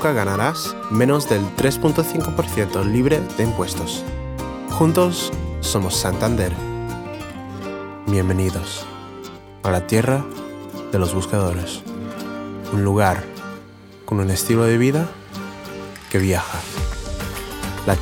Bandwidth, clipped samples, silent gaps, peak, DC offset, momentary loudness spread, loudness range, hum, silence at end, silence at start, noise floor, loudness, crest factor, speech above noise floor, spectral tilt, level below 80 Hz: 20 kHz; under 0.1%; none; -4 dBFS; under 0.1%; 15 LU; 4 LU; none; 0 s; 0 s; -41 dBFS; -21 LUFS; 18 dB; 22 dB; -5.5 dB/octave; -38 dBFS